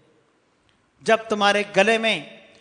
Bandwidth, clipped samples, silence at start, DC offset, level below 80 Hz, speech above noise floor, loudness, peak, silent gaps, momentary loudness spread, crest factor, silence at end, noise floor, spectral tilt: 10.5 kHz; under 0.1%; 1.05 s; under 0.1%; -70 dBFS; 43 dB; -20 LUFS; -2 dBFS; none; 7 LU; 20 dB; 0.3 s; -63 dBFS; -3.5 dB/octave